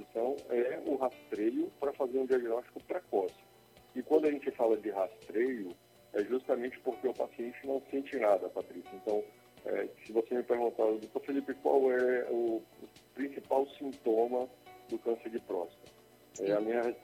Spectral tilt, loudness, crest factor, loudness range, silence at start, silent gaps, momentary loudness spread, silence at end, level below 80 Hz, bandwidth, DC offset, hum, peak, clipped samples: -6 dB/octave; -34 LUFS; 20 dB; 3 LU; 0 s; none; 11 LU; 0.05 s; -76 dBFS; 16.5 kHz; under 0.1%; none; -14 dBFS; under 0.1%